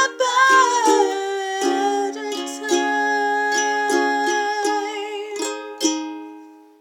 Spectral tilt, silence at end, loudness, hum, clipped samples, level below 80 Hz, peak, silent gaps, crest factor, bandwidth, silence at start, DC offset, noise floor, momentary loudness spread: 0.5 dB/octave; 0.25 s; -20 LUFS; none; under 0.1%; -80 dBFS; -4 dBFS; none; 16 dB; 17 kHz; 0 s; under 0.1%; -42 dBFS; 13 LU